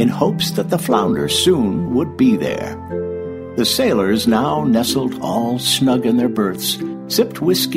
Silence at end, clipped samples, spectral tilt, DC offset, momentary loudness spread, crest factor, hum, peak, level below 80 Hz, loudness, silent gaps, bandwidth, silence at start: 0 s; under 0.1%; -4.5 dB/octave; under 0.1%; 9 LU; 16 dB; none; -2 dBFS; -48 dBFS; -17 LUFS; none; 16 kHz; 0 s